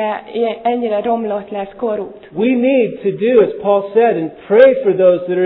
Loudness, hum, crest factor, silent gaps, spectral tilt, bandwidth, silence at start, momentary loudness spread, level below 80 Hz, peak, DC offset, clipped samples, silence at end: -14 LUFS; none; 14 dB; none; -10 dB/octave; 4.2 kHz; 0 s; 11 LU; -58 dBFS; 0 dBFS; under 0.1%; under 0.1%; 0 s